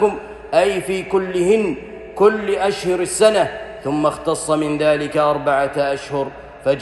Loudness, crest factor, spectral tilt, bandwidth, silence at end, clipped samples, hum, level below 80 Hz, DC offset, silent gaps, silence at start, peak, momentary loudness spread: -18 LUFS; 18 dB; -4.5 dB/octave; 12.5 kHz; 0 s; under 0.1%; none; -48 dBFS; under 0.1%; none; 0 s; -2 dBFS; 9 LU